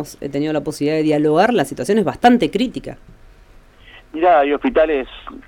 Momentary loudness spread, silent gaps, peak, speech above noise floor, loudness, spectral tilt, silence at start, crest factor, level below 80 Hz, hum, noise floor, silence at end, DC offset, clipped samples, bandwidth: 11 LU; none; 0 dBFS; 29 dB; -17 LUFS; -6 dB/octave; 0 s; 16 dB; -44 dBFS; none; -45 dBFS; 0.1 s; under 0.1%; under 0.1%; 17 kHz